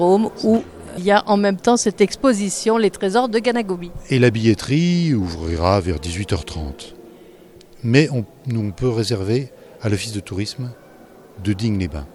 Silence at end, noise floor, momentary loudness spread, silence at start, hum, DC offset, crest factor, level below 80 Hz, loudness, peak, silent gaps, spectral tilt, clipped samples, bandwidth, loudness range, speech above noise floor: 0.05 s; -44 dBFS; 12 LU; 0 s; none; under 0.1%; 18 dB; -40 dBFS; -19 LUFS; 0 dBFS; none; -5.5 dB/octave; under 0.1%; 13.5 kHz; 6 LU; 26 dB